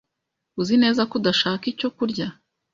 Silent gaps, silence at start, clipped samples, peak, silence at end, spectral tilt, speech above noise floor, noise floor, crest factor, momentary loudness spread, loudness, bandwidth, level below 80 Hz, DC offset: none; 0.55 s; under 0.1%; -6 dBFS; 0.4 s; -5 dB/octave; 59 dB; -81 dBFS; 16 dB; 11 LU; -22 LUFS; 7.4 kHz; -62 dBFS; under 0.1%